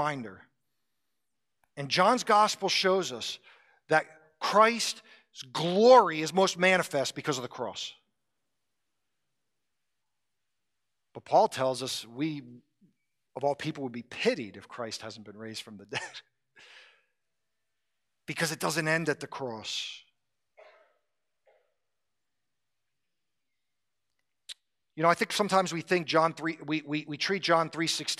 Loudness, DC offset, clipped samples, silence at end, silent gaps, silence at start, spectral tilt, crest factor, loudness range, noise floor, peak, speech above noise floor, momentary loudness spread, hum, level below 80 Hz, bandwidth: -28 LUFS; under 0.1%; under 0.1%; 0.05 s; none; 0 s; -3.5 dB/octave; 24 dB; 16 LU; -87 dBFS; -8 dBFS; 59 dB; 19 LU; none; -80 dBFS; 15 kHz